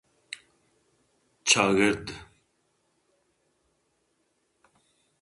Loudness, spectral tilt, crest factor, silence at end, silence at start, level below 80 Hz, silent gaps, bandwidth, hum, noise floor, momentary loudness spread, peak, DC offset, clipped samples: -23 LUFS; -2.5 dB/octave; 28 dB; 3 s; 0.3 s; -62 dBFS; none; 11.5 kHz; none; -73 dBFS; 22 LU; -4 dBFS; under 0.1%; under 0.1%